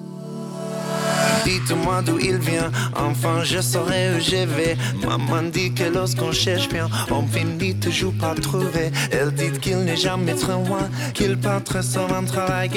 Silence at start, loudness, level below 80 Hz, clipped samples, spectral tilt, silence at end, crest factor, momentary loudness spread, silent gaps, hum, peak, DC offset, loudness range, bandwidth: 0 s; -21 LUFS; -42 dBFS; under 0.1%; -4.5 dB/octave; 0 s; 14 dB; 4 LU; none; none; -6 dBFS; under 0.1%; 1 LU; 17.5 kHz